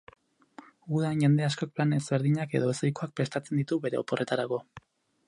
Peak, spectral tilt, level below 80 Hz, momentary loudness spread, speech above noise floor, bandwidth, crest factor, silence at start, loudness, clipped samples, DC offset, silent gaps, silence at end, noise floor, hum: -12 dBFS; -6.5 dB/octave; -70 dBFS; 8 LU; 25 dB; 11 kHz; 18 dB; 0.85 s; -29 LUFS; under 0.1%; under 0.1%; none; 0.5 s; -53 dBFS; none